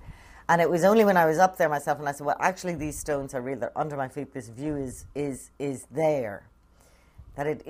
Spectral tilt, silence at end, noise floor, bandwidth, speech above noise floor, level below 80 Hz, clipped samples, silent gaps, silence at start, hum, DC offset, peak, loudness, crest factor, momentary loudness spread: -5.5 dB/octave; 0 s; -58 dBFS; 15.5 kHz; 32 dB; -54 dBFS; under 0.1%; none; 0.05 s; none; under 0.1%; -6 dBFS; -26 LUFS; 20 dB; 15 LU